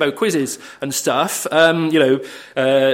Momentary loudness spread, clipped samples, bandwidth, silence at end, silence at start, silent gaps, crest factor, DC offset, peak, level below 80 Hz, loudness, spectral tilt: 10 LU; under 0.1%; 16.5 kHz; 0 s; 0 s; none; 16 dB; under 0.1%; 0 dBFS; -66 dBFS; -17 LUFS; -3.5 dB/octave